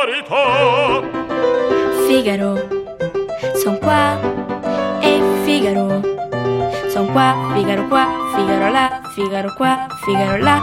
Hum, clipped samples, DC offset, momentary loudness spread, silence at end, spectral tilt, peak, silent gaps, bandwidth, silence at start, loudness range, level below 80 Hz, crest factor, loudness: none; under 0.1%; under 0.1%; 7 LU; 0 s; -5.5 dB/octave; 0 dBFS; none; 16.5 kHz; 0 s; 1 LU; -48 dBFS; 16 dB; -17 LUFS